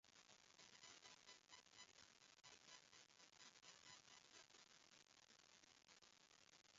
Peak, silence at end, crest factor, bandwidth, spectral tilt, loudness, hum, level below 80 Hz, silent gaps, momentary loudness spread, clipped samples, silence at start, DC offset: -48 dBFS; 0 s; 22 dB; 7.6 kHz; 0.5 dB/octave; -66 LUFS; none; under -90 dBFS; none; 6 LU; under 0.1%; 0.05 s; under 0.1%